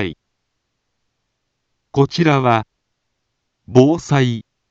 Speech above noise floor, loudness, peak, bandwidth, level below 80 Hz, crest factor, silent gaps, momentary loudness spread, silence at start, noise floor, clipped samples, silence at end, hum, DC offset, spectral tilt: 59 dB; -16 LUFS; 0 dBFS; 7.8 kHz; -54 dBFS; 18 dB; none; 11 LU; 0 s; -73 dBFS; under 0.1%; 0.3 s; none; under 0.1%; -7 dB/octave